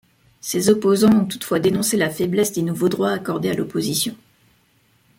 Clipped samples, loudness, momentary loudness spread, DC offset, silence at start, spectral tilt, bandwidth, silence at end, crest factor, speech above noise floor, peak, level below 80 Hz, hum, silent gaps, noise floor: under 0.1%; -19 LUFS; 8 LU; under 0.1%; 0.45 s; -5 dB/octave; 17 kHz; 1.05 s; 18 dB; 41 dB; -4 dBFS; -58 dBFS; none; none; -60 dBFS